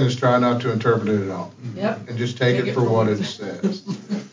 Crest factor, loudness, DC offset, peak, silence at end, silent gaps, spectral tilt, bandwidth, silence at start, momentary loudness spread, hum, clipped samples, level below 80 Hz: 16 dB; -22 LUFS; under 0.1%; -4 dBFS; 0.05 s; none; -7 dB/octave; 7.6 kHz; 0 s; 11 LU; none; under 0.1%; -62 dBFS